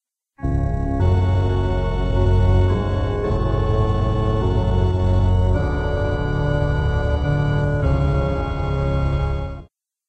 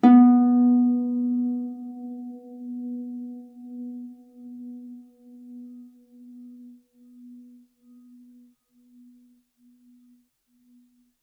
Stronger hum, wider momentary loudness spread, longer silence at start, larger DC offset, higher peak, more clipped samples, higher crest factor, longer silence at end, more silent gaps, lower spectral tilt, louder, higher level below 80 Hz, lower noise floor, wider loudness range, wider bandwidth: neither; second, 5 LU vs 28 LU; first, 0.4 s vs 0.05 s; neither; about the same, -6 dBFS vs -4 dBFS; neither; second, 12 dB vs 22 dB; second, 0.45 s vs 4.75 s; neither; about the same, -8.5 dB/octave vs -9 dB/octave; about the same, -20 LUFS vs -22 LUFS; first, -24 dBFS vs -86 dBFS; second, -44 dBFS vs -65 dBFS; second, 1 LU vs 26 LU; first, 8.2 kHz vs 3.7 kHz